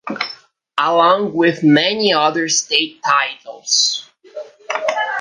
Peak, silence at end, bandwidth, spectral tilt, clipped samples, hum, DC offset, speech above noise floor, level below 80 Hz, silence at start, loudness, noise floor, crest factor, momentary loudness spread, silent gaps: -2 dBFS; 0 s; 10.5 kHz; -2.5 dB/octave; under 0.1%; none; under 0.1%; 23 dB; -68 dBFS; 0.05 s; -16 LUFS; -39 dBFS; 16 dB; 14 LU; none